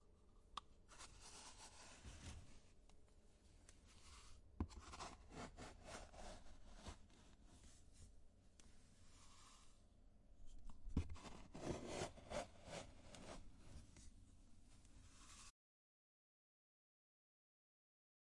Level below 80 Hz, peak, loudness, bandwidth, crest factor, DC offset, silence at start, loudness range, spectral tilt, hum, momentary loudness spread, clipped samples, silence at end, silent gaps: -64 dBFS; -30 dBFS; -57 LUFS; 11.5 kHz; 28 dB; under 0.1%; 0 s; 15 LU; -4.5 dB/octave; none; 18 LU; under 0.1%; 2.7 s; none